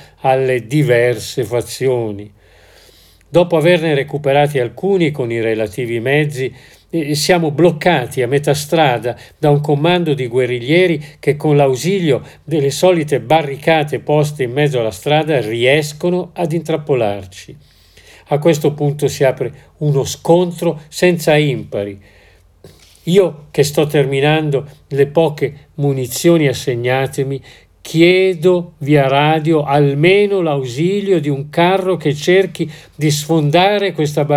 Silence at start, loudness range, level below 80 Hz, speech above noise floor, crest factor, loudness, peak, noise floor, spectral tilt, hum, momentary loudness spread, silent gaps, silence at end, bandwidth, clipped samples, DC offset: 0 s; 4 LU; -52 dBFS; 32 dB; 14 dB; -15 LUFS; 0 dBFS; -46 dBFS; -6 dB/octave; none; 8 LU; none; 0 s; 16 kHz; under 0.1%; under 0.1%